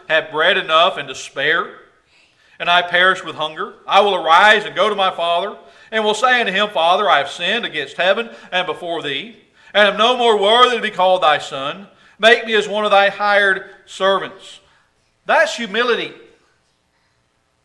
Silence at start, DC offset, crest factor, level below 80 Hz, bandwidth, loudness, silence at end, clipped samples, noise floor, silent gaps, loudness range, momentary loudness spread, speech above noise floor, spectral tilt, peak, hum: 0.1 s; under 0.1%; 18 dB; -66 dBFS; 12 kHz; -15 LUFS; 1.5 s; under 0.1%; -63 dBFS; none; 4 LU; 12 LU; 47 dB; -2.5 dB/octave; 0 dBFS; none